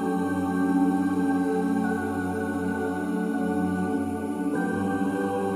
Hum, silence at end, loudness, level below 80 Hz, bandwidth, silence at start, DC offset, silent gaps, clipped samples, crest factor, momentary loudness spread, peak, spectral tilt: none; 0 s; -26 LUFS; -66 dBFS; 14.5 kHz; 0 s; under 0.1%; none; under 0.1%; 12 dB; 5 LU; -12 dBFS; -7.5 dB/octave